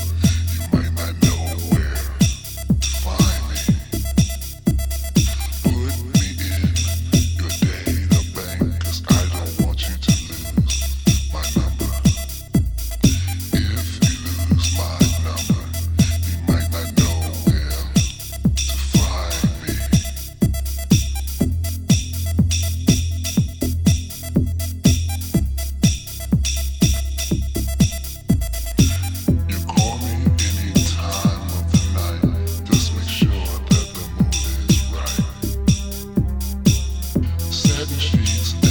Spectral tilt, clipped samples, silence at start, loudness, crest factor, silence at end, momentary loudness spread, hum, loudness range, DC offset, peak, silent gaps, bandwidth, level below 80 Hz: -5 dB/octave; under 0.1%; 0 s; -20 LUFS; 18 dB; 0 s; 5 LU; none; 1 LU; under 0.1%; -2 dBFS; none; over 20 kHz; -26 dBFS